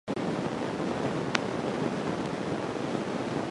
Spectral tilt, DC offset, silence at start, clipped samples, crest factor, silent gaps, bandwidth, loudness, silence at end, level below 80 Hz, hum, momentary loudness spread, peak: -5.5 dB/octave; under 0.1%; 0.05 s; under 0.1%; 28 dB; none; 11.5 kHz; -31 LUFS; 0 s; -60 dBFS; none; 3 LU; -4 dBFS